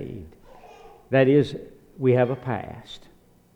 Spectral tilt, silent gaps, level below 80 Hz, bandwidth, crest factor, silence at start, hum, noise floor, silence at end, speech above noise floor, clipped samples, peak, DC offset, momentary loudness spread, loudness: -8.5 dB/octave; none; -54 dBFS; 9 kHz; 18 dB; 0 s; none; -48 dBFS; 0.55 s; 26 dB; under 0.1%; -6 dBFS; under 0.1%; 22 LU; -22 LUFS